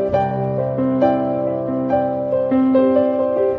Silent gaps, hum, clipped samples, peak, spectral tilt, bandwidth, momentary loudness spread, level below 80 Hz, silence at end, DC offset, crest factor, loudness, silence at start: none; none; under 0.1%; -4 dBFS; -10.5 dB/octave; 5 kHz; 6 LU; -50 dBFS; 0 s; under 0.1%; 14 dB; -18 LUFS; 0 s